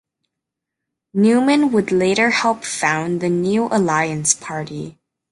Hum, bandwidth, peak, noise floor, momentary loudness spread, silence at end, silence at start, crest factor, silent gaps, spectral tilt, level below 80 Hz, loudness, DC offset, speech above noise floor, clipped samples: none; 11.5 kHz; 0 dBFS; -82 dBFS; 12 LU; 0.4 s; 1.15 s; 18 dB; none; -4 dB/octave; -60 dBFS; -17 LUFS; under 0.1%; 65 dB; under 0.1%